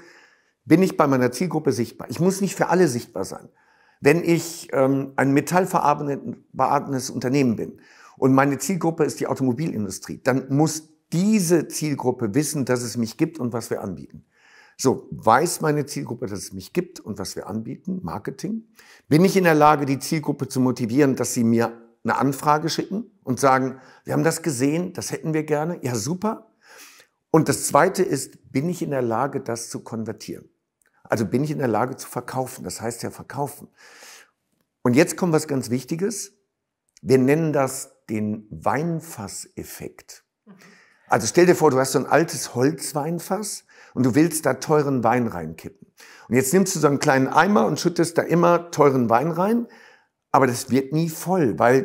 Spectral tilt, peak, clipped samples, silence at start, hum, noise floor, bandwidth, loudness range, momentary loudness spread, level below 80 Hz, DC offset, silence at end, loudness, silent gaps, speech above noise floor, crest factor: -5.5 dB/octave; -2 dBFS; under 0.1%; 0.65 s; none; -76 dBFS; 16 kHz; 7 LU; 13 LU; -62 dBFS; under 0.1%; 0 s; -22 LUFS; none; 55 dB; 20 dB